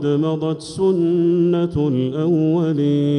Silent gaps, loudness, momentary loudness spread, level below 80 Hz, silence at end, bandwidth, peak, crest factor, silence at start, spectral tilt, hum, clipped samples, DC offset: none; -18 LUFS; 4 LU; -50 dBFS; 0 s; 10.5 kHz; -8 dBFS; 10 dB; 0 s; -8.5 dB/octave; none; under 0.1%; under 0.1%